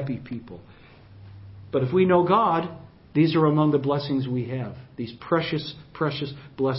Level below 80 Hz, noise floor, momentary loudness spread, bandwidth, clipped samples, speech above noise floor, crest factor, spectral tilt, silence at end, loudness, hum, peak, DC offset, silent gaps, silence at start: -56 dBFS; -46 dBFS; 17 LU; 5.8 kHz; under 0.1%; 23 dB; 18 dB; -11.5 dB/octave; 0 s; -24 LUFS; none; -6 dBFS; under 0.1%; none; 0 s